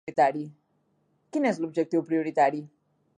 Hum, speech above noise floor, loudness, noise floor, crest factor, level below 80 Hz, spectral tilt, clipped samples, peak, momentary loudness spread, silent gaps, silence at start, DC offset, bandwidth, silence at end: none; 45 dB; -26 LUFS; -71 dBFS; 18 dB; -80 dBFS; -6.5 dB/octave; under 0.1%; -10 dBFS; 13 LU; none; 0.05 s; under 0.1%; 10 kHz; 0.5 s